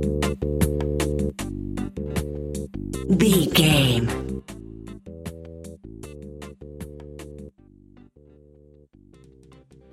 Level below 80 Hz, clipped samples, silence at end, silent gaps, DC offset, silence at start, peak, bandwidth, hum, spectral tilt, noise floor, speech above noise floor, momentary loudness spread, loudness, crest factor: -36 dBFS; under 0.1%; 2.45 s; none; under 0.1%; 0 s; -4 dBFS; 16 kHz; none; -5 dB/octave; -52 dBFS; 33 dB; 23 LU; -23 LUFS; 22 dB